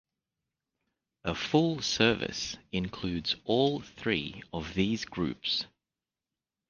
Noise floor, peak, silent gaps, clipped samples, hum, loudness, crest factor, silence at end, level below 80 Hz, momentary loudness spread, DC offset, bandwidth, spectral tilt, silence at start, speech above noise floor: under -90 dBFS; -8 dBFS; none; under 0.1%; none; -30 LUFS; 24 dB; 1.05 s; -56 dBFS; 10 LU; under 0.1%; 10 kHz; -4.5 dB/octave; 1.25 s; over 59 dB